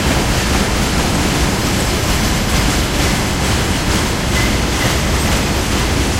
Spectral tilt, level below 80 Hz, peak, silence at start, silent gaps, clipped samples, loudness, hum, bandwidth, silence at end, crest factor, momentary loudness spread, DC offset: -4 dB/octave; -20 dBFS; -2 dBFS; 0 s; none; under 0.1%; -15 LUFS; none; 16 kHz; 0 s; 14 dB; 1 LU; under 0.1%